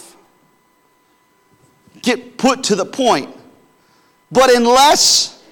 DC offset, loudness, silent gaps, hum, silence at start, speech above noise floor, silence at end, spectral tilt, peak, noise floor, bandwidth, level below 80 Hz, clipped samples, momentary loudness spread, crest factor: under 0.1%; -13 LUFS; none; none; 2.05 s; 44 dB; 0.2 s; -2 dB/octave; -4 dBFS; -57 dBFS; 19 kHz; -50 dBFS; under 0.1%; 11 LU; 14 dB